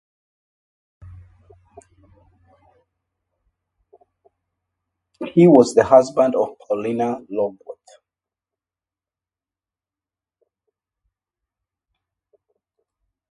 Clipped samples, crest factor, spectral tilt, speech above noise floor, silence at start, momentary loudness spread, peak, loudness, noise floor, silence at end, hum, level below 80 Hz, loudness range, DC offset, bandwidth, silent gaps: under 0.1%; 24 dB; -7 dB/octave; over 74 dB; 1.05 s; 17 LU; 0 dBFS; -17 LUFS; under -90 dBFS; 5.6 s; none; -58 dBFS; 13 LU; under 0.1%; 11.5 kHz; none